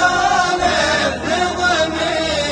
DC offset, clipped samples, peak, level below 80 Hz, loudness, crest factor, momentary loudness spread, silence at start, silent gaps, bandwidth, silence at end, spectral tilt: under 0.1%; under 0.1%; -2 dBFS; -38 dBFS; -16 LUFS; 14 dB; 3 LU; 0 s; none; 10.5 kHz; 0 s; -3 dB/octave